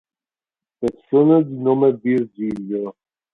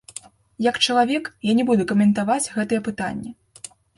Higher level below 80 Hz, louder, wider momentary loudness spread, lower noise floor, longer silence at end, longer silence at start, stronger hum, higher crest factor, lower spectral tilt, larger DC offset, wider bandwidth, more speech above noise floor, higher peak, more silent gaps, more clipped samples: about the same, -60 dBFS vs -58 dBFS; about the same, -19 LUFS vs -21 LUFS; second, 12 LU vs 20 LU; first, under -90 dBFS vs -44 dBFS; second, 0.45 s vs 0.65 s; first, 0.8 s vs 0.6 s; neither; about the same, 16 dB vs 18 dB; first, -10 dB/octave vs -4.5 dB/octave; neither; second, 4.5 kHz vs 11.5 kHz; first, over 72 dB vs 23 dB; about the same, -4 dBFS vs -4 dBFS; neither; neither